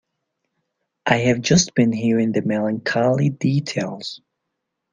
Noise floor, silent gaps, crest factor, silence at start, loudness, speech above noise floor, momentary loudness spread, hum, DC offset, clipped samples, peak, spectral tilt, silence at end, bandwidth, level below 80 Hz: -78 dBFS; none; 20 dB; 1.05 s; -19 LUFS; 59 dB; 12 LU; none; under 0.1%; under 0.1%; -2 dBFS; -5 dB/octave; 0.75 s; 9.6 kHz; -56 dBFS